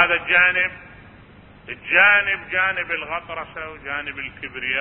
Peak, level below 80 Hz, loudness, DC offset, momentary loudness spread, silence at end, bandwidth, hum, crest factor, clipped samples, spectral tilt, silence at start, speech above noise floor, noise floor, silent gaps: -2 dBFS; -52 dBFS; -18 LUFS; under 0.1%; 18 LU; 0 s; 4.1 kHz; none; 20 dB; under 0.1%; -7.5 dB/octave; 0 s; 25 dB; -46 dBFS; none